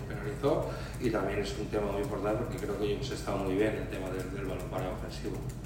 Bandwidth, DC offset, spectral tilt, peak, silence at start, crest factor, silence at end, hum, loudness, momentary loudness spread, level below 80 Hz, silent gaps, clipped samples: 16 kHz; under 0.1%; -6.5 dB/octave; -16 dBFS; 0 s; 16 dB; 0 s; none; -34 LUFS; 7 LU; -44 dBFS; none; under 0.1%